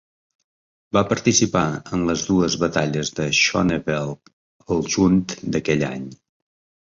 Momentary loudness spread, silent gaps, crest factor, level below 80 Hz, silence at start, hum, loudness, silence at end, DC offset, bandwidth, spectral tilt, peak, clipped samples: 9 LU; 4.33-4.60 s; 18 dB; -46 dBFS; 0.95 s; none; -20 LUFS; 0.8 s; under 0.1%; 7.6 kHz; -4 dB/octave; -2 dBFS; under 0.1%